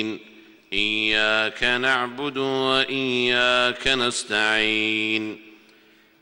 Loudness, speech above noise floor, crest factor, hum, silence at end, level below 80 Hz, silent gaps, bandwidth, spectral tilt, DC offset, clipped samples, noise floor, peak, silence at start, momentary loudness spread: -21 LUFS; 33 dB; 18 dB; none; 0.7 s; -52 dBFS; none; 16 kHz; -2.5 dB/octave; under 0.1%; under 0.1%; -55 dBFS; -6 dBFS; 0 s; 8 LU